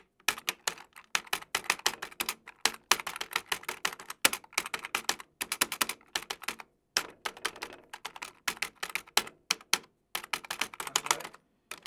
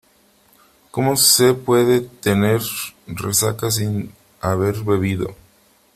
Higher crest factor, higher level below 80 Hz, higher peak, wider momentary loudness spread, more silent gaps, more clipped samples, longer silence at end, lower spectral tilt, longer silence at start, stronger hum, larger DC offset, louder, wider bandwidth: first, 32 dB vs 18 dB; second, -70 dBFS vs -52 dBFS; about the same, -2 dBFS vs 0 dBFS; second, 11 LU vs 15 LU; neither; neither; second, 0.05 s vs 0.6 s; second, 1 dB/octave vs -4 dB/octave; second, 0.3 s vs 0.95 s; neither; neither; second, -32 LUFS vs -18 LUFS; first, over 20 kHz vs 16 kHz